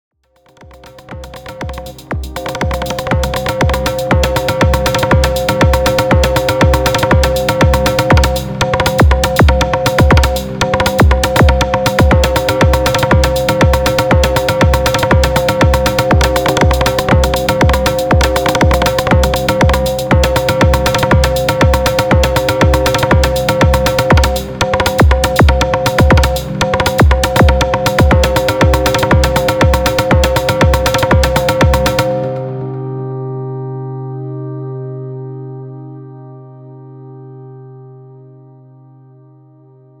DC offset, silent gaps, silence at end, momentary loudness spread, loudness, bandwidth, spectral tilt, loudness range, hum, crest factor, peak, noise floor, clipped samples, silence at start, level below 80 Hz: under 0.1%; none; 1.85 s; 13 LU; -12 LUFS; over 20 kHz; -5.5 dB/octave; 11 LU; none; 12 dB; 0 dBFS; -48 dBFS; under 0.1%; 0.85 s; -18 dBFS